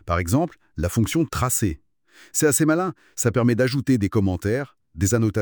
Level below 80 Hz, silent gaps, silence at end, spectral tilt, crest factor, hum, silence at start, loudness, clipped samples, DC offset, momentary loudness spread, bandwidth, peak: -46 dBFS; none; 0 s; -5.5 dB/octave; 16 dB; none; 0.05 s; -22 LUFS; under 0.1%; under 0.1%; 8 LU; over 20 kHz; -6 dBFS